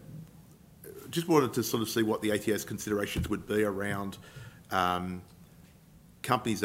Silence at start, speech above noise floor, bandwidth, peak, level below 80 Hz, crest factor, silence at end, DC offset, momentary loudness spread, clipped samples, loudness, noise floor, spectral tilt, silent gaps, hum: 0 s; 26 dB; 16 kHz; -8 dBFS; -56 dBFS; 24 dB; 0 s; under 0.1%; 21 LU; under 0.1%; -31 LUFS; -56 dBFS; -5 dB/octave; none; none